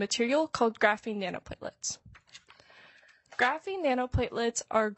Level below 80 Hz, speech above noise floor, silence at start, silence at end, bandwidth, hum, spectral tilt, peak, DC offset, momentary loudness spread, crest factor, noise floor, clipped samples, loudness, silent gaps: -52 dBFS; 29 dB; 0 s; 0.05 s; 8.6 kHz; none; -3.5 dB/octave; -8 dBFS; under 0.1%; 12 LU; 22 dB; -59 dBFS; under 0.1%; -30 LUFS; none